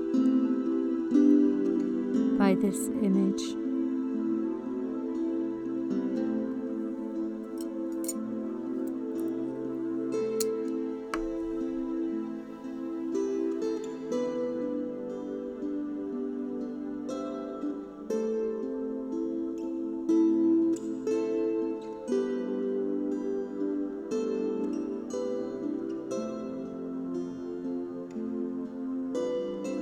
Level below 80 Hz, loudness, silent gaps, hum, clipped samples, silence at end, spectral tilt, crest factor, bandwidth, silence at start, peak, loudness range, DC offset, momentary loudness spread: -62 dBFS; -31 LUFS; none; none; under 0.1%; 0 s; -6.5 dB/octave; 18 dB; over 20 kHz; 0 s; -12 dBFS; 7 LU; under 0.1%; 10 LU